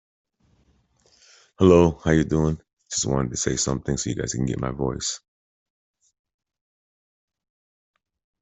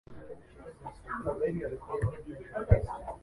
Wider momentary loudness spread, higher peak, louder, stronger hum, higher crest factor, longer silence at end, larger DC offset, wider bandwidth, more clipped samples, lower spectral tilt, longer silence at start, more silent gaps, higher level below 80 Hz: second, 12 LU vs 20 LU; first, -2 dBFS vs -8 dBFS; first, -22 LUFS vs -33 LUFS; neither; about the same, 22 dB vs 24 dB; first, 3.25 s vs 0.05 s; neither; second, 8.4 kHz vs 11.5 kHz; neither; second, -5 dB/octave vs -9.5 dB/octave; first, 1.6 s vs 0.1 s; first, 2.73-2.77 s vs none; about the same, -44 dBFS vs -40 dBFS